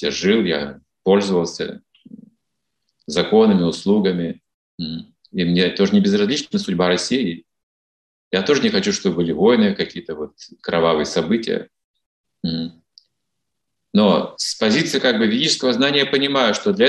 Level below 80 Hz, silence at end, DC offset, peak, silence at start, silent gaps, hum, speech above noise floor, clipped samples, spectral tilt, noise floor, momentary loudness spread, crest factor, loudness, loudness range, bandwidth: -58 dBFS; 0 s; under 0.1%; -2 dBFS; 0 s; 4.54-4.78 s, 7.63-8.31 s, 11.84-11.94 s, 12.06-12.24 s; none; 61 dB; under 0.1%; -5 dB/octave; -79 dBFS; 13 LU; 18 dB; -18 LUFS; 5 LU; 11.5 kHz